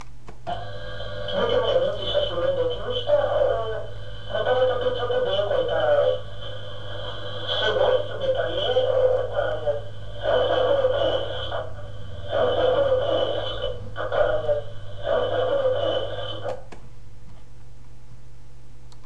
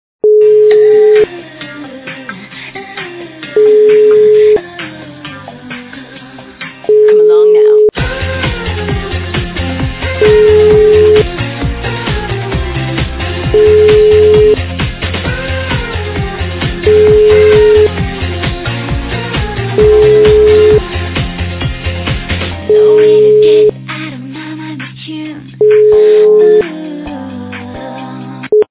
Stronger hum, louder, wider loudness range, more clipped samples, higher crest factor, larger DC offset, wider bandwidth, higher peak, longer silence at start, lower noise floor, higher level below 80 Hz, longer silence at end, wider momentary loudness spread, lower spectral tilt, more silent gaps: neither; second, -24 LUFS vs -9 LUFS; first, 4 LU vs 1 LU; neither; first, 16 dB vs 10 dB; first, 3% vs under 0.1%; first, 8.4 kHz vs 4 kHz; second, -8 dBFS vs 0 dBFS; second, 0 s vs 0.25 s; first, -46 dBFS vs -31 dBFS; second, -44 dBFS vs -24 dBFS; about the same, 0 s vs 0.05 s; second, 14 LU vs 19 LU; second, -5.5 dB/octave vs -10.5 dB/octave; neither